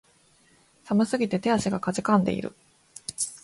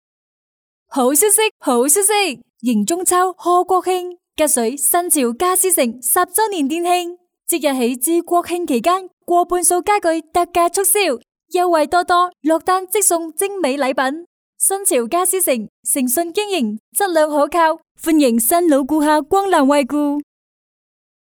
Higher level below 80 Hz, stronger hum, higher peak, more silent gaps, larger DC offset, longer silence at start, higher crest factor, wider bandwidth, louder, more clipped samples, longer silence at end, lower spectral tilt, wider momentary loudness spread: about the same, -58 dBFS vs -56 dBFS; neither; second, -6 dBFS vs 0 dBFS; second, none vs 1.51-1.60 s, 9.13-9.17 s, 14.26-14.53 s, 15.69-15.83 s, 16.80-16.92 s, 17.91-17.95 s; neither; about the same, 0.85 s vs 0.9 s; about the same, 20 dB vs 16 dB; second, 11.5 kHz vs over 20 kHz; second, -26 LUFS vs -16 LUFS; neither; second, 0.05 s vs 1.1 s; first, -5 dB/octave vs -2 dB/octave; first, 14 LU vs 7 LU